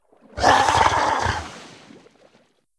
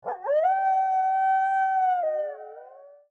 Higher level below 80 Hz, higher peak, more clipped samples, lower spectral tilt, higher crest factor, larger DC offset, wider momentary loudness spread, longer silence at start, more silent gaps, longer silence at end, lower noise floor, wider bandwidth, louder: first, -40 dBFS vs -82 dBFS; first, -2 dBFS vs -14 dBFS; neither; about the same, -3 dB/octave vs -3 dB/octave; first, 20 dB vs 10 dB; neither; first, 23 LU vs 10 LU; first, 0.35 s vs 0.05 s; neither; first, 1.1 s vs 0.25 s; first, -60 dBFS vs -48 dBFS; first, 11 kHz vs 6.4 kHz; first, -19 LUFS vs -24 LUFS